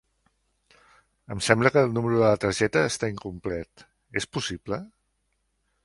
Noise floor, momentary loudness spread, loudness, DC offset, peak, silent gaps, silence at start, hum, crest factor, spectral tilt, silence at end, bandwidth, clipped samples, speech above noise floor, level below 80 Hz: -74 dBFS; 14 LU; -25 LUFS; under 0.1%; -2 dBFS; none; 1.3 s; none; 26 dB; -5 dB/octave; 0.95 s; 11.5 kHz; under 0.1%; 49 dB; -54 dBFS